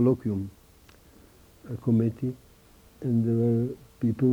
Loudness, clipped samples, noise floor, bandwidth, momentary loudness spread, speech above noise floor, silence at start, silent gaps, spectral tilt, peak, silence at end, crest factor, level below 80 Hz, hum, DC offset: -27 LUFS; under 0.1%; -55 dBFS; 15.5 kHz; 13 LU; 30 dB; 0 s; none; -10.5 dB/octave; -12 dBFS; 0 s; 16 dB; -58 dBFS; none; under 0.1%